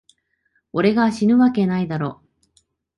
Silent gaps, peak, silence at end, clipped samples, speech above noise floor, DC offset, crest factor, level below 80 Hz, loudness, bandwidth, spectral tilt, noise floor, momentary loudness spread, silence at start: none; -4 dBFS; 0.85 s; under 0.1%; 50 dB; under 0.1%; 16 dB; -56 dBFS; -19 LUFS; 11 kHz; -7.5 dB/octave; -68 dBFS; 11 LU; 0.75 s